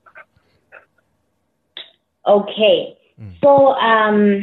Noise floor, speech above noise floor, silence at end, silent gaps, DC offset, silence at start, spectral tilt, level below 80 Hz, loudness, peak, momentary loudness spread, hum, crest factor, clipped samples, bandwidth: -68 dBFS; 55 dB; 0 s; none; under 0.1%; 1.75 s; -8.5 dB/octave; -62 dBFS; -14 LUFS; -2 dBFS; 24 LU; none; 14 dB; under 0.1%; 4.2 kHz